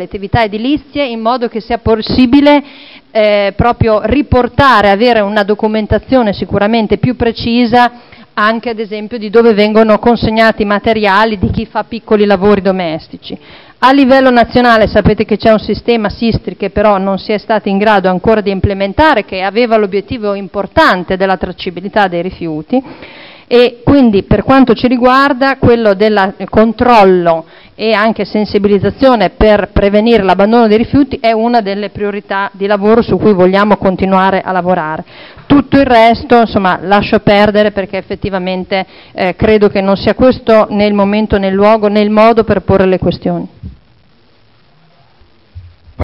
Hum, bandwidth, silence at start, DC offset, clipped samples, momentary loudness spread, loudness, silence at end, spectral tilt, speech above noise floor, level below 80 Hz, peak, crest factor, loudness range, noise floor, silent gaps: none; 7.6 kHz; 0 s; under 0.1%; 0.1%; 9 LU; -10 LUFS; 0 s; -8 dB/octave; 39 dB; -30 dBFS; 0 dBFS; 10 dB; 3 LU; -49 dBFS; none